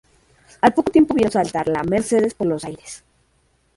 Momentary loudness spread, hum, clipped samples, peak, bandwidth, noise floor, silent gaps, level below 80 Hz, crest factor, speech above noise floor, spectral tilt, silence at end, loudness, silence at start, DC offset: 18 LU; none; under 0.1%; -2 dBFS; 11.5 kHz; -62 dBFS; none; -50 dBFS; 18 dB; 44 dB; -6 dB/octave; 0.8 s; -19 LUFS; 0.65 s; under 0.1%